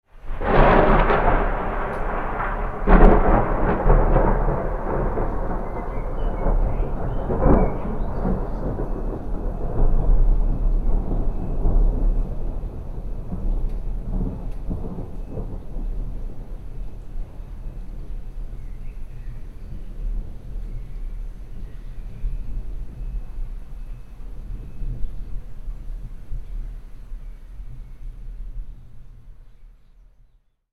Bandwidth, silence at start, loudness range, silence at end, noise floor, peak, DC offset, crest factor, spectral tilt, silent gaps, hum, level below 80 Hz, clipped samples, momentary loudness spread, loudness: 4 kHz; 0.15 s; 18 LU; 1.05 s; -57 dBFS; 0 dBFS; under 0.1%; 22 dB; -9.5 dB/octave; none; none; -24 dBFS; under 0.1%; 21 LU; -24 LUFS